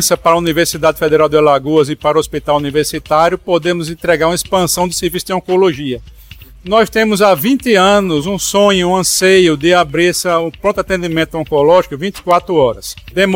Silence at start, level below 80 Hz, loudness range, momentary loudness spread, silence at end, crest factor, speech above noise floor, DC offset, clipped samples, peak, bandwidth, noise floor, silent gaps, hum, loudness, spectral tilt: 0 s; -38 dBFS; 4 LU; 7 LU; 0 s; 12 dB; 24 dB; under 0.1%; under 0.1%; 0 dBFS; 17 kHz; -36 dBFS; none; none; -12 LUFS; -4 dB/octave